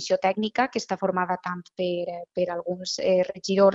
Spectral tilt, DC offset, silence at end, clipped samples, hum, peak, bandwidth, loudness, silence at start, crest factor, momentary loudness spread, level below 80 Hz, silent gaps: -4.5 dB/octave; under 0.1%; 0 s; under 0.1%; none; -8 dBFS; 8 kHz; -26 LUFS; 0 s; 18 dB; 7 LU; -66 dBFS; none